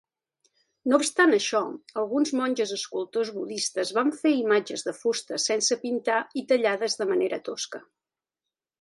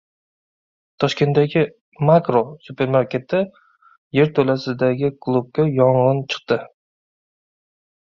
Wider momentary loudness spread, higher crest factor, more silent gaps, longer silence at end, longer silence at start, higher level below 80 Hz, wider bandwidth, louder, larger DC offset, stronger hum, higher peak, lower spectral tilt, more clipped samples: about the same, 10 LU vs 8 LU; about the same, 20 dB vs 18 dB; second, none vs 1.81-1.92 s, 3.98-4.11 s; second, 1 s vs 1.45 s; second, 0.85 s vs 1 s; second, -80 dBFS vs -58 dBFS; first, 11.5 kHz vs 7.6 kHz; second, -26 LUFS vs -19 LUFS; neither; neither; second, -6 dBFS vs -2 dBFS; second, -2 dB/octave vs -7.5 dB/octave; neither